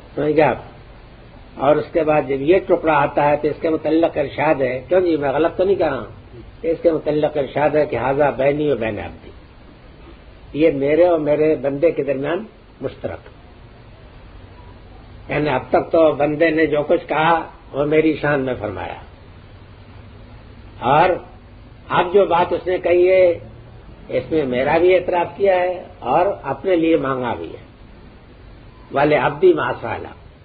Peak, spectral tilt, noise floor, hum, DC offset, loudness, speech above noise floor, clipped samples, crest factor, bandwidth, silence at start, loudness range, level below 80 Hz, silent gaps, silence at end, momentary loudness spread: -2 dBFS; -10 dB/octave; -42 dBFS; none; under 0.1%; -18 LUFS; 25 dB; under 0.1%; 16 dB; 4.9 kHz; 0.05 s; 6 LU; -44 dBFS; none; 0.25 s; 13 LU